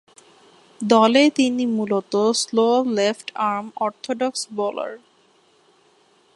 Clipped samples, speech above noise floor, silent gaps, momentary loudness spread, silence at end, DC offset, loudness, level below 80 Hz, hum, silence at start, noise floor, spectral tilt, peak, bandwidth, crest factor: under 0.1%; 38 dB; none; 11 LU; 1.4 s; under 0.1%; -20 LUFS; -72 dBFS; none; 0.8 s; -58 dBFS; -4 dB/octave; -2 dBFS; 11.5 kHz; 20 dB